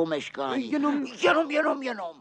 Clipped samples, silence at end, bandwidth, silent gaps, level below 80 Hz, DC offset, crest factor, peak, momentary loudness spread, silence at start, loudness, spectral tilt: under 0.1%; 0.1 s; 9.4 kHz; none; -76 dBFS; under 0.1%; 18 dB; -10 dBFS; 7 LU; 0 s; -26 LUFS; -4.5 dB/octave